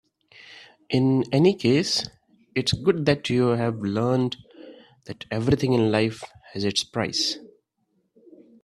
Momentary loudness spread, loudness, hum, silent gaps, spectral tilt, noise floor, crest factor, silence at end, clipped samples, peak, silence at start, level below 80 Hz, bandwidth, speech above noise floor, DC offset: 16 LU; -23 LUFS; none; none; -5.5 dB/octave; -72 dBFS; 20 dB; 1.2 s; under 0.1%; -4 dBFS; 0.5 s; -54 dBFS; 13 kHz; 49 dB; under 0.1%